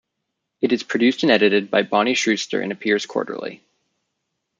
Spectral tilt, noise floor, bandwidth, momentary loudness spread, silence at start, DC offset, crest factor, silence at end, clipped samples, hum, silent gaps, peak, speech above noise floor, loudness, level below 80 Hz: -4 dB/octave; -78 dBFS; 9.2 kHz; 10 LU; 0.6 s; under 0.1%; 20 dB; 1.05 s; under 0.1%; none; none; -2 dBFS; 59 dB; -19 LUFS; -70 dBFS